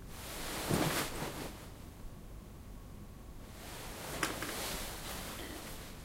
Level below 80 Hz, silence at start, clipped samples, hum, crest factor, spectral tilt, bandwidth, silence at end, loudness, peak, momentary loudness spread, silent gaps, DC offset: -50 dBFS; 0 s; under 0.1%; none; 28 dB; -3.5 dB/octave; 16 kHz; 0 s; -39 LUFS; -14 dBFS; 18 LU; none; under 0.1%